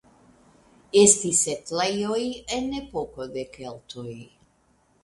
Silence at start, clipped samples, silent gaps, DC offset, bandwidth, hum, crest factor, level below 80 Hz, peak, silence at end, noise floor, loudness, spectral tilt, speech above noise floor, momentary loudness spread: 0.95 s; under 0.1%; none; under 0.1%; 11.5 kHz; none; 26 dB; -56 dBFS; 0 dBFS; 0.8 s; -64 dBFS; -23 LUFS; -2.5 dB/octave; 39 dB; 22 LU